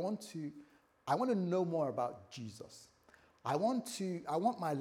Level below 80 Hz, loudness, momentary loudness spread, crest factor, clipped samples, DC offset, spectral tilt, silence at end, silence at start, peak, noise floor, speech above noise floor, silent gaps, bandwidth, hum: -82 dBFS; -37 LUFS; 15 LU; 18 dB; under 0.1%; under 0.1%; -6 dB/octave; 0 s; 0 s; -20 dBFS; -66 dBFS; 30 dB; none; 17 kHz; none